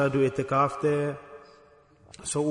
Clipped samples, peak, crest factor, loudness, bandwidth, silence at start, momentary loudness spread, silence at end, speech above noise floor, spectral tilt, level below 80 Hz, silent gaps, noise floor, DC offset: under 0.1%; -12 dBFS; 16 dB; -27 LUFS; 11 kHz; 0 s; 16 LU; 0 s; 31 dB; -6 dB/octave; -60 dBFS; none; -57 dBFS; under 0.1%